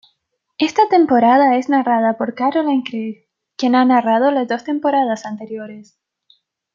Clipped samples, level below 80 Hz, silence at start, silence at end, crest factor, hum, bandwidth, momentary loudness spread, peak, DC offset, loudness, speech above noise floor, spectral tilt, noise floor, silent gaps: under 0.1%; -70 dBFS; 0.6 s; 0.9 s; 16 dB; none; 7.4 kHz; 16 LU; -2 dBFS; under 0.1%; -16 LUFS; 54 dB; -5.5 dB/octave; -70 dBFS; none